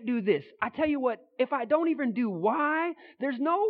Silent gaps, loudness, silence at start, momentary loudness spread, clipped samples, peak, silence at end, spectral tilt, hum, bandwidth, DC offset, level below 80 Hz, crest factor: none; -29 LUFS; 0 s; 7 LU; under 0.1%; -10 dBFS; 0 s; -10 dB/octave; none; 4.9 kHz; under 0.1%; -70 dBFS; 18 dB